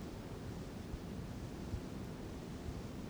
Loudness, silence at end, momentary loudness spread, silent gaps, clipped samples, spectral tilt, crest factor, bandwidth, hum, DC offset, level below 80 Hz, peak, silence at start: -47 LUFS; 0 s; 2 LU; none; under 0.1%; -6.5 dB/octave; 16 dB; over 20 kHz; none; under 0.1%; -52 dBFS; -30 dBFS; 0 s